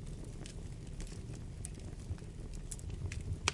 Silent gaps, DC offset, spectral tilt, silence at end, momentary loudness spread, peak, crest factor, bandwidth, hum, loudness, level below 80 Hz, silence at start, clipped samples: none; under 0.1%; -4 dB/octave; 0 s; 5 LU; -12 dBFS; 32 dB; 11.5 kHz; none; -45 LUFS; -48 dBFS; 0 s; under 0.1%